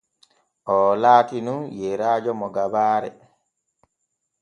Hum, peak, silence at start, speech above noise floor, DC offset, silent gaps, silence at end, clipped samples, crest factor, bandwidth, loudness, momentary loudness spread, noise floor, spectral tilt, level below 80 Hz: none; -2 dBFS; 0.65 s; 57 dB; under 0.1%; none; 1.3 s; under 0.1%; 22 dB; 9.4 kHz; -21 LUFS; 13 LU; -77 dBFS; -6.5 dB/octave; -66 dBFS